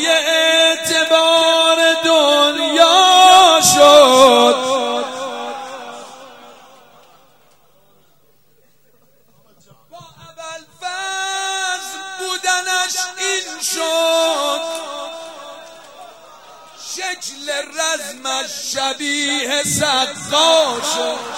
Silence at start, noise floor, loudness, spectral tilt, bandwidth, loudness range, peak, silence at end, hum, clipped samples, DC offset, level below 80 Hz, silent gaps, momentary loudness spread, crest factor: 0 s; -58 dBFS; -13 LUFS; -1 dB/octave; 16.5 kHz; 17 LU; 0 dBFS; 0 s; none; under 0.1%; 0.2%; -62 dBFS; none; 21 LU; 16 dB